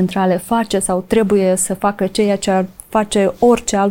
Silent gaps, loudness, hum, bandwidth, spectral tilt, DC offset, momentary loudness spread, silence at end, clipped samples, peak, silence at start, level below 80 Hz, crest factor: none; -16 LUFS; none; 17 kHz; -5 dB/octave; under 0.1%; 4 LU; 0 s; under 0.1%; -2 dBFS; 0 s; -44 dBFS; 14 dB